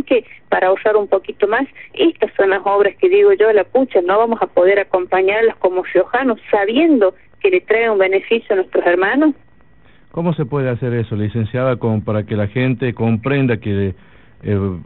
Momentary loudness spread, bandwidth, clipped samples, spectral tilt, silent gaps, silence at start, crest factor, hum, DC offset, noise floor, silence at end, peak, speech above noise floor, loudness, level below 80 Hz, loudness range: 7 LU; 4.2 kHz; under 0.1%; -5.5 dB/octave; none; 0 s; 12 dB; none; 0.5%; -50 dBFS; 0.05 s; -2 dBFS; 35 dB; -16 LUFS; -50 dBFS; 5 LU